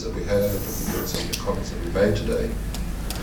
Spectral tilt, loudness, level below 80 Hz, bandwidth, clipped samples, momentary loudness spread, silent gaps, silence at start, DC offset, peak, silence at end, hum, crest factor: -5 dB/octave; -26 LUFS; -32 dBFS; over 20 kHz; under 0.1%; 8 LU; none; 0 s; under 0.1%; -6 dBFS; 0 s; none; 18 dB